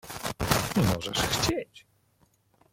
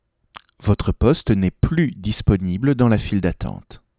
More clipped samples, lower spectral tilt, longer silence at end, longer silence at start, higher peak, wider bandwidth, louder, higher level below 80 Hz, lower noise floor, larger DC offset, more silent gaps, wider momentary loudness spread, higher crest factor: neither; second, -4 dB/octave vs -12 dB/octave; first, 0.95 s vs 0.25 s; second, 0.05 s vs 0.6 s; second, -6 dBFS vs -2 dBFS; first, 17 kHz vs 4 kHz; second, -27 LUFS vs -20 LUFS; second, -46 dBFS vs -30 dBFS; first, -67 dBFS vs -47 dBFS; neither; neither; about the same, 10 LU vs 9 LU; first, 24 dB vs 18 dB